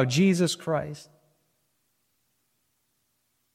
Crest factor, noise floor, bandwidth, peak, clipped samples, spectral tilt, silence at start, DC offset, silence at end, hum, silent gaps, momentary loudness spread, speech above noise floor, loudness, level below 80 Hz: 20 dB; -74 dBFS; 14.5 kHz; -10 dBFS; under 0.1%; -5.5 dB/octave; 0 s; under 0.1%; 2.5 s; none; none; 18 LU; 49 dB; -25 LUFS; -66 dBFS